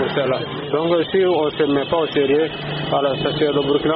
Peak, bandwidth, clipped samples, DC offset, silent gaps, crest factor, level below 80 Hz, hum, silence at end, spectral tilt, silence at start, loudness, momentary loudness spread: -6 dBFS; 5.2 kHz; under 0.1%; under 0.1%; none; 12 dB; -50 dBFS; none; 0 s; -4 dB/octave; 0 s; -19 LUFS; 5 LU